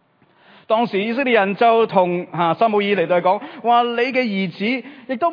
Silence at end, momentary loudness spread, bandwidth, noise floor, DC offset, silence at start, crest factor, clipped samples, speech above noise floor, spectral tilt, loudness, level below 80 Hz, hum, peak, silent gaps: 0 s; 7 LU; 5.2 kHz; -54 dBFS; under 0.1%; 0.7 s; 16 dB; under 0.1%; 37 dB; -8 dB/octave; -18 LUFS; -76 dBFS; none; -2 dBFS; none